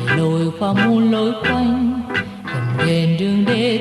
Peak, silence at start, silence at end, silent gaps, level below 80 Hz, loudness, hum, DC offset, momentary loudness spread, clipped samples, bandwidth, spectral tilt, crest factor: -4 dBFS; 0 s; 0 s; none; -46 dBFS; -18 LUFS; none; under 0.1%; 7 LU; under 0.1%; 12 kHz; -7 dB/octave; 12 dB